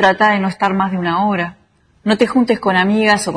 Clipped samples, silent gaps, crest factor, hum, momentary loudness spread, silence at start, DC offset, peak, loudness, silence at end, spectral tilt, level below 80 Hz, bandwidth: under 0.1%; none; 16 dB; none; 7 LU; 0 s; under 0.1%; 0 dBFS; -15 LUFS; 0 s; -5 dB/octave; -52 dBFS; 11 kHz